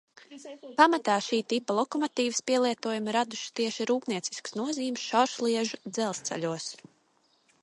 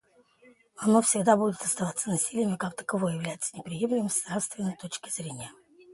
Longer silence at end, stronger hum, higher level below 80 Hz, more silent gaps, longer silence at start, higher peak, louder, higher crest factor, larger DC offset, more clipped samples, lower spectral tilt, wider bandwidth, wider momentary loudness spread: first, 0.85 s vs 0 s; neither; second, -80 dBFS vs -70 dBFS; neither; second, 0.3 s vs 0.8 s; about the same, -6 dBFS vs -8 dBFS; about the same, -29 LUFS vs -28 LUFS; about the same, 24 dB vs 22 dB; neither; neither; second, -3 dB/octave vs -4.5 dB/octave; about the same, 11.5 kHz vs 12 kHz; about the same, 11 LU vs 12 LU